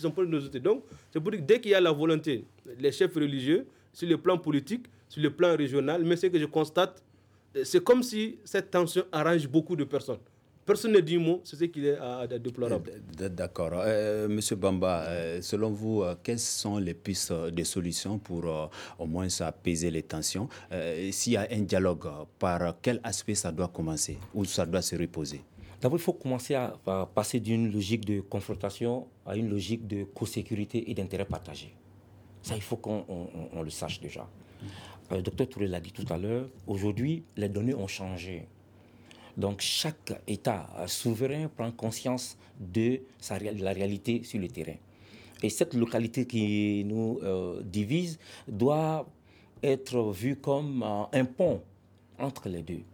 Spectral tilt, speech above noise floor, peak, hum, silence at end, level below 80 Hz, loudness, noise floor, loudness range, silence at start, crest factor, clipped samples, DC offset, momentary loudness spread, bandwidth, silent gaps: -5 dB/octave; 28 dB; -10 dBFS; none; 0.05 s; -58 dBFS; -30 LUFS; -58 dBFS; 7 LU; 0 s; 20 dB; under 0.1%; under 0.1%; 11 LU; 19.5 kHz; none